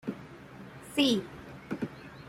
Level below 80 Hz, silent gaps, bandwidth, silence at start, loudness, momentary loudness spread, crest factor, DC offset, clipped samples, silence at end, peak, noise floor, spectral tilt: -64 dBFS; none; 15.5 kHz; 0.05 s; -31 LUFS; 21 LU; 20 dB; under 0.1%; under 0.1%; 0 s; -14 dBFS; -48 dBFS; -4.5 dB/octave